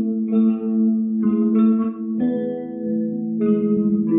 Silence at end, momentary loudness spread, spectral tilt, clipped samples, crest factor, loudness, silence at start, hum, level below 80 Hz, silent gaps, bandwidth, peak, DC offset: 0 s; 7 LU; -14 dB/octave; under 0.1%; 12 dB; -20 LUFS; 0 s; none; -66 dBFS; none; 3.6 kHz; -8 dBFS; under 0.1%